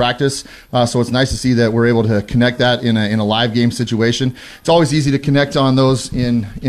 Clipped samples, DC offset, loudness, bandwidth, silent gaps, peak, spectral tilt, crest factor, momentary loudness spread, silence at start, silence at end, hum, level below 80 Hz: under 0.1%; under 0.1%; -15 LUFS; 13.5 kHz; none; -2 dBFS; -5.5 dB/octave; 12 dB; 5 LU; 0 s; 0 s; none; -38 dBFS